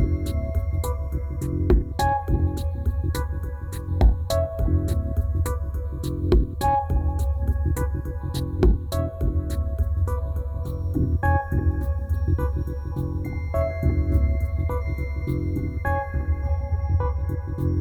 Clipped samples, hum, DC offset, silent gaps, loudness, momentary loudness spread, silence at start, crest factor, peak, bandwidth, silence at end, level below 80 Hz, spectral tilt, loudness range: under 0.1%; none; under 0.1%; none; -25 LUFS; 7 LU; 0 s; 18 dB; -6 dBFS; 15.5 kHz; 0 s; -26 dBFS; -7.5 dB/octave; 1 LU